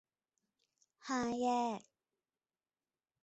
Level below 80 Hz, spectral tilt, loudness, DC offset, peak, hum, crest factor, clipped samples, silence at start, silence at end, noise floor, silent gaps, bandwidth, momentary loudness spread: -78 dBFS; -3 dB/octave; -38 LUFS; under 0.1%; -24 dBFS; none; 18 dB; under 0.1%; 1.05 s; 1.45 s; under -90 dBFS; none; 8 kHz; 13 LU